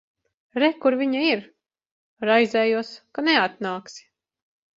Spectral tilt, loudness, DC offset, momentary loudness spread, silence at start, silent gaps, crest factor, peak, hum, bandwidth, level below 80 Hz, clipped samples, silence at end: -4.5 dB/octave; -22 LUFS; under 0.1%; 13 LU; 0.55 s; 1.91-2.17 s; 20 dB; -4 dBFS; none; 7.8 kHz; -72 dBFS; under 0.1%; 0.8 s